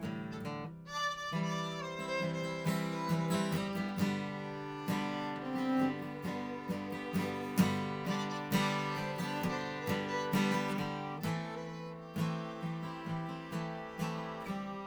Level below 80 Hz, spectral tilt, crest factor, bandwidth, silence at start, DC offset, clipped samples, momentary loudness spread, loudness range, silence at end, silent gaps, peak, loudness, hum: -66 dBFS; -5.5 dB/octave; 20 dB; over 20 kHz; 0 s; under 0.1%; under 0.1%; 9 LU; 4 LU; 0 s; none; -16 dBFS; -37 LUFS; none